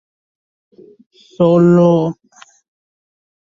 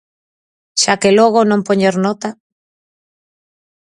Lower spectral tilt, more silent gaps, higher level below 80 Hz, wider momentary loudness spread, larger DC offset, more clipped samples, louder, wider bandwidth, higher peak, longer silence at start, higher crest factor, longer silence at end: first, -9.5 dB/octave vs -4 dB/octave; neither; about the same, -58 dBFS vs -60 dBFS; about the same, 13 LU vs 11 LU; neither; neither; about the same, -12 LUFS vs -13 LUFS; second, 7.4 kHz vs 11.5 kHz; about the same, -2 dBFS vs 0 dBFS; first, 1.4 s vs 0.75 s; about the same, 16 dB vs 16 dB; second, 1.4 s vs 1.65 s